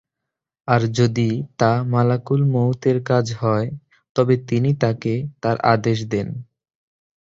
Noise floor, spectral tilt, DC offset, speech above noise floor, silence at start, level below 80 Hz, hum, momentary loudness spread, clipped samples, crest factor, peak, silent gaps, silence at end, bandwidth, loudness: -83 dBFS; -7.5 dB/octave; under 0.1%; 64 dB; 0.65 s; -54 dBFS; none; 7 LU; under 0.1%; 18 dB; -2 dBFS; 4.09-4.15 s; 0.8 s; 7.6 kHz; -20 LUFS